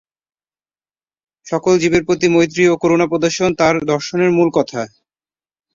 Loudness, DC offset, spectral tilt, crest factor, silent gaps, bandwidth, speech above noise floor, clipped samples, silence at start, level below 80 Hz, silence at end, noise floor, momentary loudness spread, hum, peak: -15 LUFS; under 0.1%; -5.5 dB/octave; 16 dB; none; 7.6 kHz; over 75 dB; under 0.1%; 1.45 s; -50 dBFS; 0.85 s; under -90 dBFS; 8 LU; none; -2 dBFS